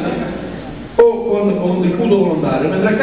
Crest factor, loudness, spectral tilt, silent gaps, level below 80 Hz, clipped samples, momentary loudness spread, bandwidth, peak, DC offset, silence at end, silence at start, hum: 14 dB; -15 LUFS; -11.5 dB/octave; none; -42 dBFS; under 0.1%; 12 LU; 4 kHz; 0 dBFS; 0.4%; 0 s; 0 s; none